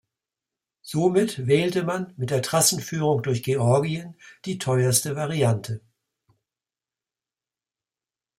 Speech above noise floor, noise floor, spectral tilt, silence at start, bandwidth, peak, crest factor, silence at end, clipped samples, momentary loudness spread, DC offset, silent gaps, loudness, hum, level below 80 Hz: over 67 dB; under -90 dBFS; -4.5 dB/octave; 0.85 s; 16 kHz; -6 dBFS; 20 dB; 2.6 s; under 0.1%; 13 LU; under 0.1%; none; -23 LUFS; none; -64 dBFS